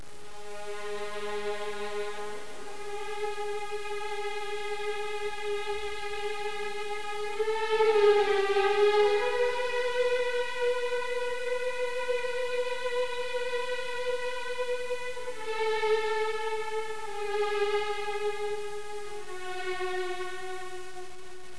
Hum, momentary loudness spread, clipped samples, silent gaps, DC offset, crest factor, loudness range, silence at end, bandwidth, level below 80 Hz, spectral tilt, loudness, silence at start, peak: none; 14 LU; under 0.1%; none; 2%; 18 dB; 10 LU; 0 s; 11 kHz; -64 dBFS; -2.5 dB/octave; -31 LUFS; 0 s; -12 dBFS